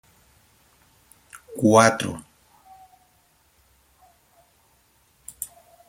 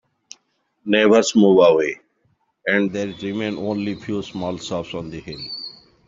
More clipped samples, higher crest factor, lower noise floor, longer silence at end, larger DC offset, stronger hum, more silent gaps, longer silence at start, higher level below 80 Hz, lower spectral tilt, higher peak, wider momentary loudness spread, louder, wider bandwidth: neither; first, 26 dB vs 18 dB; second, -62 dBFS vs -67 dBFS; about the same, 0.45 s vs 0.35 s; neither; neither; neither; first, 1.35 s vs 0.85 s; second, -64 dBFS vs -58 dBFS; about the same, -4.5 dB/octave vs -5 dB/octave; about the same, -2 dBFS vs -2 dBFS; first, 29 LU vs 17 LU; about the same, -21 LUFS vs -19 LUFS; first, 16.5 kHz vs 7.8 kHz